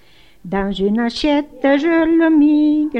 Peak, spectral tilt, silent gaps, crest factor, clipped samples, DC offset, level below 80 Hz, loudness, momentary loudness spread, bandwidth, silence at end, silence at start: -4 dBFS; -6.5 dB/octave; none; 12 dB; under 0.1%; 0.4%; -42 dBFS; -15 LUFS; 8 LU; 8.2 kHz; 0 s; 0.45 s